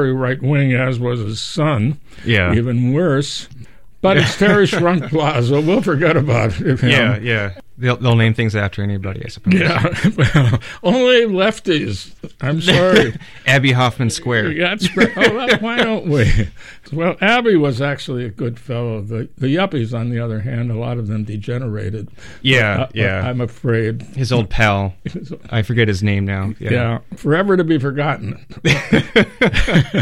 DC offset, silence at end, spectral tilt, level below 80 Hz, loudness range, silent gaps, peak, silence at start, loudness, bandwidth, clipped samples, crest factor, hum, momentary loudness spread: 1%; 0 s; -6 dB/octave; -34 dBFS; 4 LU; none; 0 dBFS; 0 s; -16 LUFS; 12.5 kHz; under 0.1%; 16 dB; none; 11 LU